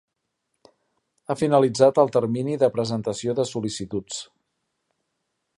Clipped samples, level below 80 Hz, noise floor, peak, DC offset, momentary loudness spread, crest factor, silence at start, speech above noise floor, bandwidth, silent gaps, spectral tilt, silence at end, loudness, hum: under 0.1%; -62 dBFS; -78 dBFS; -4 dBFS; under 0.1%; 14 LU; 20 dB; 1.3 s; 56 dB; 11.5 kHz; none; -6 dB/octave; 1.35 s; -22 LUFS; none